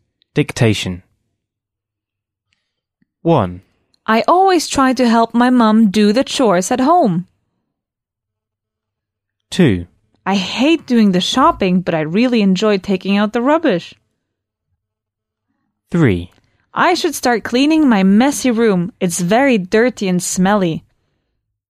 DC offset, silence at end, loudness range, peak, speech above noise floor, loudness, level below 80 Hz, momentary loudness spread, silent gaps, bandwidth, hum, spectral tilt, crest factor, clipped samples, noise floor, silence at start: under 0.1%; 1 s; 8 LU; -2 dBFS; 69 dB; -14 LUFS; -48 dBFS; 10 LU; none; 15.5 kHz; none; -5.5 dB/octave; 14 dB; under 0.1%; -82 dBFS; 0.35 s